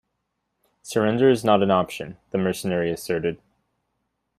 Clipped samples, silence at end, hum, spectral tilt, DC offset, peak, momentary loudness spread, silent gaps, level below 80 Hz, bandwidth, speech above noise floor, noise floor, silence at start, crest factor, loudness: under 0.1%; 1.05 s; none; -6 dB/octave; under 0.1%; -4 dBFS; 11 LU; none; -60 dBFS; 15 kHz; 55 dB; -77 dBFS; 0.85 s; 20 dB; -22 LUFS